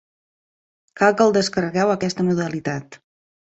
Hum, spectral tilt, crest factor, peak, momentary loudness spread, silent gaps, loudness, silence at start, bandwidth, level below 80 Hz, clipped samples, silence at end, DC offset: none; -5.5 dB/octave; 20 dB; -2 dBFS; 11 LU; none; -20 LUFS; 0.95 s; 8.2 kHz; -60 dBFS; under 0.1%; 0.5 s; under 0.1%